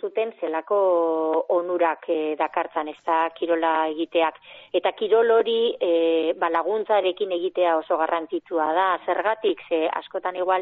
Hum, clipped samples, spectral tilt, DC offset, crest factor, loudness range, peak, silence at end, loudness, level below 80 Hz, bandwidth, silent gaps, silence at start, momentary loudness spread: none; under 0.1%; -0.5 dB/octave; under 0.1%; 14 dB; 2 LU; -8 dBFS; 0 s; -23 LUFS; -74 dBFS; 4.1 kHz; none; 0.05 s; 6 LU